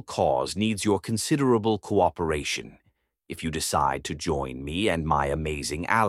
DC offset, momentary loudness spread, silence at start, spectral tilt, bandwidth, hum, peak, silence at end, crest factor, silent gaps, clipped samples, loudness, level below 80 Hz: under 0.1%; 7 LU; 0.1 s; -4.5 dB/octave; 16 kHz; none; -6 dBFS; 0 s; 20 dB; none; under 0.1%; -26 LUFS; -44 dBFS